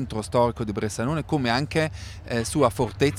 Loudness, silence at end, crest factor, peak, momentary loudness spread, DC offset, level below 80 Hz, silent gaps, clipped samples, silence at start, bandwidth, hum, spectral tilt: -25 LUFS; 0 s; 18 dB; -6 dBFS; 6 LU; under 0.1%; -44 dBFS; none; under 0.1%; 0 s; 16 kHz; none; -5.5 dB/octave